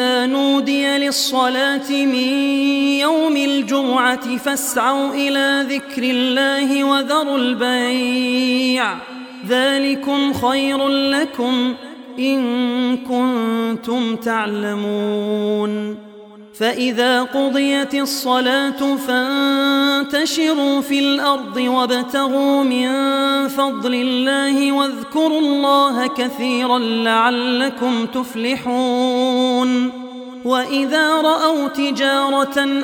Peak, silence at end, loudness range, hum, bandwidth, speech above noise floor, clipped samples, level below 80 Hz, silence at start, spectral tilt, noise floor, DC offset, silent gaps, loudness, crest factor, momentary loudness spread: -2 dBFS; 0 s; 3 LU; none; 18.5 kHz; 22 dB; under 0.1%; -64 dBFS; 0 s; -3 dB/octave; -39 dBFS; under 0.1%; none; -17 LUFS; 16 dB; 5 LU